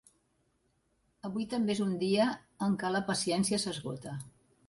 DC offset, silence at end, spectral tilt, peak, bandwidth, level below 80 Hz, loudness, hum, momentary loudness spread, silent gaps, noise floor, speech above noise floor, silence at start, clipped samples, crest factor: under 0.1%; 0.4 s; -4.5 dB/octave; -16 dBFS; 11.5 kHz; -68 dBFS; -32 LUFS; none; 13 LU; none; -75 dBFS; 43 dB; 1.25 s; under 0.1%; 18 dB